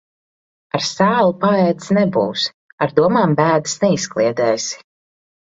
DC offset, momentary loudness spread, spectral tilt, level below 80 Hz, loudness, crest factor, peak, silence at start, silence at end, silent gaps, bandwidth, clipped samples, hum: under 0.1%; 8 LU; -5 dB/octave; -58 dBFS; -17 LUFS; 16 dB; 0 dBFS; 0.75 s; 0.65 s; 2.54-2.78 s; 8 kHz; under 0.1%; none